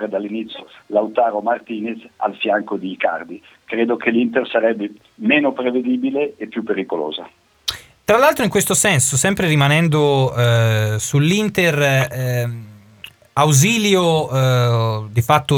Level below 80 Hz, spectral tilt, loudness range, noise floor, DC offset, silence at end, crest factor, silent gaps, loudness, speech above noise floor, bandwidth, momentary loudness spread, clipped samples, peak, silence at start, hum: -52 dBFS; -4.5 dB/octave; 6 LU; -42 dBFS; under 0.1%; 0 s; 18 dB; none; -17 LUFS; 25 dB; 19.5 kHz; 13 LU; under 0.1%; 0 dBFS; 0 s; none